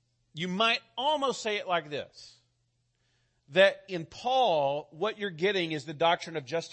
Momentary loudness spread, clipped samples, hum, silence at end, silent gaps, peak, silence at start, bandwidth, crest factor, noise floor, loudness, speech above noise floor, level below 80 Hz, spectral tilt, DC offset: 14 LU; under 0.1%; none; 0 s; none; -10 dBFS; 0.35 s; 8.8 kHz; 20 dB; -75 dBFS; -29 LUFS; 46 dB; -74 dBFS; -4 dB/octave; under 0.1%